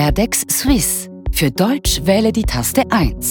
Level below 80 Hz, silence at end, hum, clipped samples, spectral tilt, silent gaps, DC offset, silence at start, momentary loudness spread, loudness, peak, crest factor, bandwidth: -26 dBFS; 0 s; none; under 0.1%; -4 dB/octave; none; under 0.1%; 0 s; 4 LU; -16 LUFS; 0 dBFS; 16 dB; 17.5 kHz